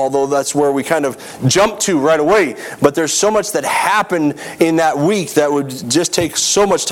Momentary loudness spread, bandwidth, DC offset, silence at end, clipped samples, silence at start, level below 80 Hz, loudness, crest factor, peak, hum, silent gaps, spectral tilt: 5 LU; 17.5 kHz; under 0.1%; 0 s; under 0.1%; 0 s; -48 dBFS; -15 LUFS; 14 dB; 0 dBFS; none; none; -3.5 dB/octave